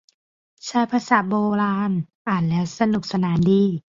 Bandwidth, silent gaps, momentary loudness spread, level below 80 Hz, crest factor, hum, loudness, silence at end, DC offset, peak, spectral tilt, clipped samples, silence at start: 7.6 kHz; 2.15-2.25 s; 7 LU; -54 dBFS; 18 dB; none; -21 LUFS; 0.2 s; under 0.1%; -4 dBFS; -7 dB/octave; under 0.1%; 0.65 s